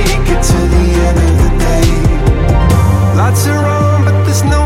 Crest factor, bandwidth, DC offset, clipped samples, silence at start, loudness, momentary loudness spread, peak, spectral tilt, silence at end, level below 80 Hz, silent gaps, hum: 8 dB; 16 kHz; under 0.1%; under 0.1%; 0 s; -11 LUFS; 2 LU; 0 dBFS; -6 dB/octave; 0 s; -14 dBFS; none; none